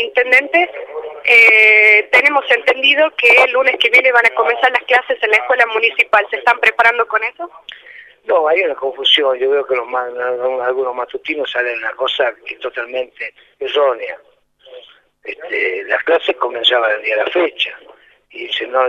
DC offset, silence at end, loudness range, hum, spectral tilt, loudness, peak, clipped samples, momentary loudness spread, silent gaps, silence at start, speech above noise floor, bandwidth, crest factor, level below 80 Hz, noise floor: under 0.1%; 0 s; 11 LU; none; -1.5 dB/octave; -13 LUFS; 0 dBFS; under 0.1%; 16 LU; none; 0 s; 27 dB; 15 kHz; 14 dB; -64 dBFS; -42 dBFS